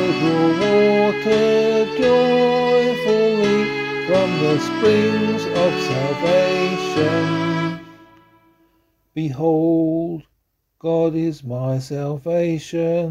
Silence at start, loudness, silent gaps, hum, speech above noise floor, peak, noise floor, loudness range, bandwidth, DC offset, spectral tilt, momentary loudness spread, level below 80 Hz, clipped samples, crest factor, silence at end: 0 s; -18 LUFS; none; none; 50 dB; -4 dBFS; -69 dBFS; 6 LU; 13 kHz; under 0.1%; -6.5 dB/octave; 9 LU; -54 dBFS; under 0.1%; 14 dB; 0 s